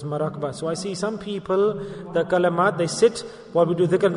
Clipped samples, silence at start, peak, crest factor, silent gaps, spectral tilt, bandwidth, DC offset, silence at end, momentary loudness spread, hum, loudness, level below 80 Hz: under 0.1%; 0 s; -6 dBFS; 16 dB; none; -5.5 dB/octave; 11 kHz; under 0.1%; 0 s; 8 LU; none; -23 LUFS; -58 dBFS